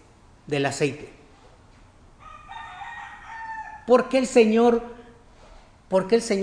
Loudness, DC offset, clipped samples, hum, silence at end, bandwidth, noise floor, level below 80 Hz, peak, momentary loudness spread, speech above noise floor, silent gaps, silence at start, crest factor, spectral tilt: -22 LUFS; under 0.1%; under 0.1%; none; 0 s; 10.5 kHz; -52 dBFS; -54 dBFS; -4 dBFS; 22 LU; 31 dB; none; 0.5 s; 20 dB; -5 dB/octave